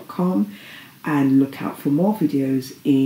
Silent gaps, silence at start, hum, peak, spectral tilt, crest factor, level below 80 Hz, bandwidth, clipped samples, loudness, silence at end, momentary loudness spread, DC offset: none; 0 s; none; -6 dBFS; -7.5 dB/octave; 14 dB; -74 dBFS; 16 kHz; under 0.1%; -21 LUFS; 0 s; 11 LU; under 0.1%